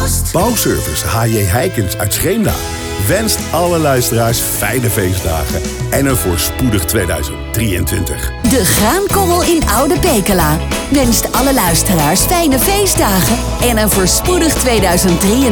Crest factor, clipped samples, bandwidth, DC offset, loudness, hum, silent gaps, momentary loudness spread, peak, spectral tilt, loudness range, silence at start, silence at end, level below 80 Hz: 10 dB; under 0.1%; over 20 kHz; under 0.1%; -12 LUFS; none; none; 6 LU; -2 dBFS; -4 dB/octave; 3 LU; 0 s; 0 s; -24 dBFS